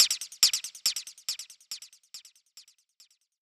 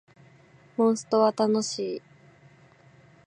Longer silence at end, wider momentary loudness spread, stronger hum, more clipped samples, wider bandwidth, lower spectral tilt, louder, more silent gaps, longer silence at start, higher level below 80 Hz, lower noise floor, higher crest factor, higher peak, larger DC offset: second, 0.8 s vs 1.3 s; first, 24 LU vs 13 LU; neither; neither; first, 19 kHz vs 10 kHz; second, 4.5 dB/octave vs -5 dB/octave; about the same, -27 LUFS vs -25 LUFS; neither; second, 0 s vs 0.8 s; second, -86 dBFS vs -76 dBFS; first, -64 dBFS vs -56 dBFS; first, 26 dB vs 20 dB; first, -6 dBFS vs -10 dBFS; neither